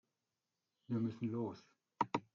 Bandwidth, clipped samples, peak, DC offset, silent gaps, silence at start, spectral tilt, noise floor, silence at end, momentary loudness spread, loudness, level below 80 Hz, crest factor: 7.4 kHz; under 0.1%; -20 dBFS; under 0.1%; none; 0.9 s; -7.5 dB/octave; under -90 dBFS; 0.15 s; 6 LU; -42 LUFS; -82 dBFS; 24 dB